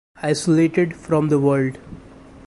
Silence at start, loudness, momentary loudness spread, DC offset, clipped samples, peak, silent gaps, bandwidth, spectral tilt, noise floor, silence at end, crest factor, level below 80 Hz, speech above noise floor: 0.2 s; -19 LUFS; 7 LU; under 0.1%; under 0.1%; -6 dBFS; none; 11.5 kHz; -6.5 dB/octave; -43 dBFS; 0.1 s; 14 dB; -52 dBFS; 24 dB